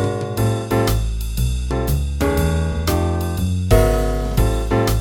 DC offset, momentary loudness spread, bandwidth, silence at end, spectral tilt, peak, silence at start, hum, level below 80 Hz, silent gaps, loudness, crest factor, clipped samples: under 0.1%; 6 LU; 17 kHz; 0 s; -6 dB/octave; -2 dBFS; 0 s; none; -22 dBFS; none; -20 LUFS; 16 dB; under 0.1%